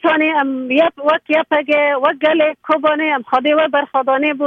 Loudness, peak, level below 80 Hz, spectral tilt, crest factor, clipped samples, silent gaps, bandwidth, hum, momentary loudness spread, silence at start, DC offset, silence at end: -15 LUFS; -2 dBFS; -64 dBFS; -5.5 dB/octave; 14 dB; under 0.1%; none; 5.6 kHz; none; 3 LU; 0.05 s; under 0.1%; 0 s